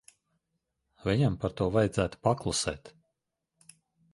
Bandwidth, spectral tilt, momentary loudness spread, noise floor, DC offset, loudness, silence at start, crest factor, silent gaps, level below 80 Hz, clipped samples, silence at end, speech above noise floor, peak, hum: 11.5 kHz; -5.5 dB/octave; 8 LU; -84 dBFS; under 0.1%; -29 LUFS; 1.05 s; 22 dB; none; -52 dBFS; under 0.1%; 1.25 s; 55 dB; -10 dBFS; none